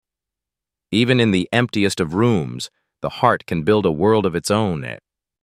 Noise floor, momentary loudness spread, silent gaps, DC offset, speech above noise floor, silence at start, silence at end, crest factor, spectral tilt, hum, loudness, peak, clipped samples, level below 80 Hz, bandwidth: -87 dBFS; 13 LU; none; under 0.1%; 69 dB; 0.9 s; 0.45 s; 18 dB; -5.5 dB/octave; none; -19 LUFS; -2 dBFS; under 0.1%; -50 dBFS; 15 kHz